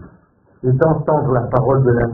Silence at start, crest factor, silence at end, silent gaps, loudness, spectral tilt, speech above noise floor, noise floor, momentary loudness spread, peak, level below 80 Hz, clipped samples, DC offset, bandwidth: 0 s; 16 dB; 0 s; none; -16 LUFS; -13 dB/octave; 37 dB; -51 dBFS; 4 LU; 0 dBFS; -38 dBFS; under 0.1%; under 0.1%; 2.3 kHz